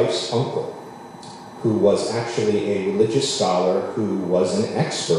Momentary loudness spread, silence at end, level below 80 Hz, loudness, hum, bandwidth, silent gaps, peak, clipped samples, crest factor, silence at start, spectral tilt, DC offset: 18 LU; 0 s; -60 dBFS; -21 LUFS; none; 11.5 kHz; none; -4 dBFS; under 0.1%; 16 dB; 0 s; -5 dB/octave; under 0.1%